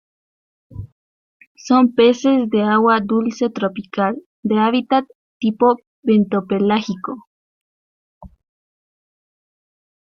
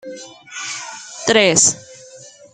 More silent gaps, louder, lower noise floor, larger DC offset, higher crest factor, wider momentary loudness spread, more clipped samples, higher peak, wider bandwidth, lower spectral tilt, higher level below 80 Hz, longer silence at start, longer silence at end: first, 0.92-1.40 s, 1.47-1.55 s, 4.26-4.43 s, 5.15-5.40 s, 5.87-6.03 s, 7.27-8.21 s vs none; about the same, -17 LUFS vs -15 LUFS; first, under -90 dBFS vs -42 dBFS; neither; about the same, 18 dB vs 20 dB; second, 14 LU vs 22 LU; neither; about the same, -2 dBFS vs 0 dBFS; second, 7 kHz vs 10.5 kHz; first, -6.5 dB/octave vs -1.5 dB/octave; first, -56 dBFS vs -62 dBFS; first, 0.75 s vs 0.05 s; first, 1.75 s vs 0.25 s